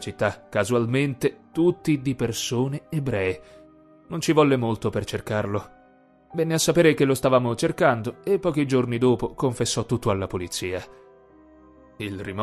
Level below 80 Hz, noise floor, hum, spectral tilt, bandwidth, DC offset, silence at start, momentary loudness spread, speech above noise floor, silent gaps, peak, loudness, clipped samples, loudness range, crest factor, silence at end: -50 dBFS; -56 dBFS; none; -5.5 dB/octave; 14 kHz; under 0.1%; 0 s; 10 LU; 33 dB; none; -6 dBFS; -24 LUFS; under 0.1%; 5 LU; 18 dB; 0 s